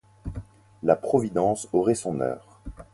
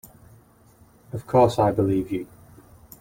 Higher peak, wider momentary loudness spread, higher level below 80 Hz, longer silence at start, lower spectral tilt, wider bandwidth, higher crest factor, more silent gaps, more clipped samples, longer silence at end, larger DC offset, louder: about the same, -6 dBFS vs -4 dBFS; about the same, 18 LU vs 18 LU; about the same, -48 dBFS vs -52 dBFS; second, 0.25 s vs 1.15 s; about the same, -6.5 dB/octave vs -7.5 dB/octave; second, 11.5 kHz vs 16.5 kHz; about the same, 20 dB vs 20 dB; neither; neither; second, 0.1 s vs 0.75 s; neither; second, -25 LUFS vs -22 LUFS